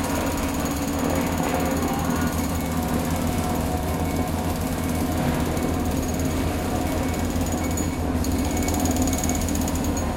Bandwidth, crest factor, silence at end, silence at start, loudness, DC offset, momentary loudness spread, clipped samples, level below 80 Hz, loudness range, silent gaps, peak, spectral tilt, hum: 17 kHz; 14 dB; 0 s; 0 s; -24 LUFS; under 0.1%; 2 LU; under 0.1%; -32 dBFS; 1 LU; none; -8 dBFS; -5 dB/octave; none